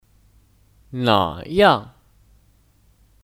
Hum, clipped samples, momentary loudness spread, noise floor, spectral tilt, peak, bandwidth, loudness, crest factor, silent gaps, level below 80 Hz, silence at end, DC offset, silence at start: none; under 0.1%; 8 LU; -57 dBFS; -6 dB/octave; -2 dBFS; 16.5 kHz; -18 LUFS; 22 dB; none; -50 dBFS; 1.4 s; under 0.1%; 0.9 s